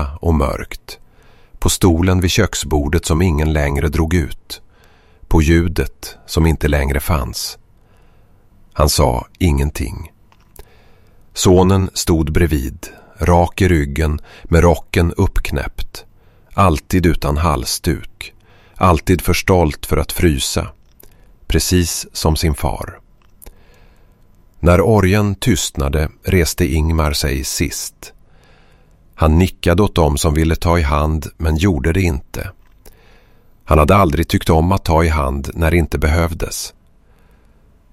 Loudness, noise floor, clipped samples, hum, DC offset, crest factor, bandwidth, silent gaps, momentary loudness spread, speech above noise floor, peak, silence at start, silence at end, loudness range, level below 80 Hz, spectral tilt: -16 LUFS; -49 dBFS; under 0.1%; none; under 0.1%; 16 dB; 16 kHz; none; 14 LU; 34 dB; 0 dBFS; 0 s; 1.25 s; 4 LU; -24 dBFS; -5.5 dB/octave